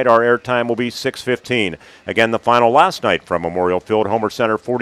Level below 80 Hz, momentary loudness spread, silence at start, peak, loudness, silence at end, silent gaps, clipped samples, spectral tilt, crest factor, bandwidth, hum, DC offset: -54 dBFS; 9 LU; 0 s; 0 dBFS; -17 LUFS; 0 s; none; under 0.1%; -5 dB/octave; 16 dB; 14.5 kHz; none; under 0.1%